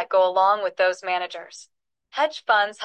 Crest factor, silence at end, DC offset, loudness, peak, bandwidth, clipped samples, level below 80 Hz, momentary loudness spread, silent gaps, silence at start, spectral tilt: 16 dB; 0 s; under 0.1%; -22 LUFS; -6 dBFS; 9.2 kHz; under 0.1%; -86 dBFS; 15 LU; none; 0 s; -1.5 dB/octave